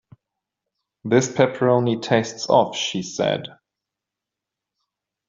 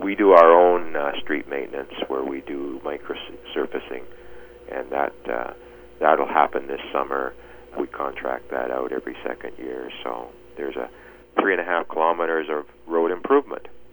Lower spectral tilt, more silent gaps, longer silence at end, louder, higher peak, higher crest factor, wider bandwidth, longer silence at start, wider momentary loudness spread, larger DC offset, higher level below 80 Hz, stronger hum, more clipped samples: second, -4.5 dB/octave vs -6.5 dB/octave; neither; first, 1.75 s vs 0.05 s; first, -20 LUFS vs -23 LUFS; about the same, -2 dBFS vs 0 dBFS; about the same, 20 dB vs 22 dB; second, 7.8 kHz vs over 20 kHz; first, 1.05 s vs 0 s; second, 8 LU vs 15 LU; neither; second, -64 dBFS vs -56 dBFS; neither; neither